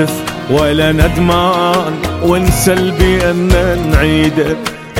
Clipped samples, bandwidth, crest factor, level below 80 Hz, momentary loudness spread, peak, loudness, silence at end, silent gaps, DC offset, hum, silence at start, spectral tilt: under 0.1%; 17 kHz; 12 dB; -20 dBFS; 5 LU; 0 dBFS; -12 LUFS; 0 s; none; under 0.1%; none; 0 s; -5.5 dB/octave